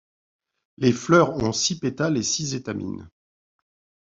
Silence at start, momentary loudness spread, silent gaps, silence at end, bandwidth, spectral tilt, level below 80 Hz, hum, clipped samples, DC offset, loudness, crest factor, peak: 0.8 s; 13 LU; none; 1.05 s; 7.8 kHz; -4.5 dB/octave; -54 dBFS; none; under 0.1%; under 0.1%; -22 LUFS; 22 dB; -4 dBFS